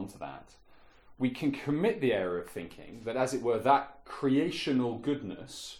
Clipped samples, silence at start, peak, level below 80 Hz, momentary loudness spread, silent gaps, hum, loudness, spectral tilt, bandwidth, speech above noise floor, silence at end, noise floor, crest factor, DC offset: under 0.1%; 0 s; -10 dBFS; -62 dBFS; 15 LU; none; none; -31 LUFS; -6 dB/octave; 14.5 kHz; 24 dB; 0 s; -56 dBFS; 20 dB; under 0.1%